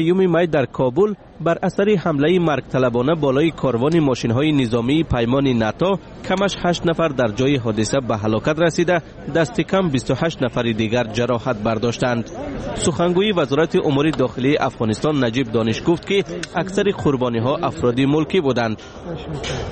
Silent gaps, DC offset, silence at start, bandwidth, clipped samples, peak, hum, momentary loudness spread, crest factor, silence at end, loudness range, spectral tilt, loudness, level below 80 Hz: none; under 0.1%; 0 s; 8.8 kHz; under 0.1%; -6 dBFS; none; 5 LU; 12 dB; 0 s; 2 LU; -6 dB/octave; -19 LUFS; -42 dBFS